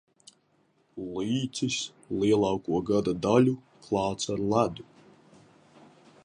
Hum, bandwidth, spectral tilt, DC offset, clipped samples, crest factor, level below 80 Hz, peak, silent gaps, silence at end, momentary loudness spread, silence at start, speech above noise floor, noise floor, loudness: none; 10.5 kHz; -5.5 dB/octave; under 0.1%; under 0.1%; 20 dB; -58 dBFS; -8 dBFS; none; 1.4 s; 13 LU; 0.95 s; 41 dB; -68 dBFS; -28 LUFS